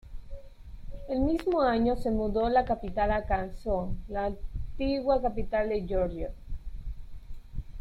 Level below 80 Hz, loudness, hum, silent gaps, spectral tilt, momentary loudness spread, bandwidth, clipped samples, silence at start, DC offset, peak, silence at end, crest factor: -38 dBFS; -29 LUFS; none; none; -8 dB/octave; 22 LU; 11.5 kHz; under 0.1%; 0.05 s; under 0.1%; -12 dBFS; 0 s; 18 dB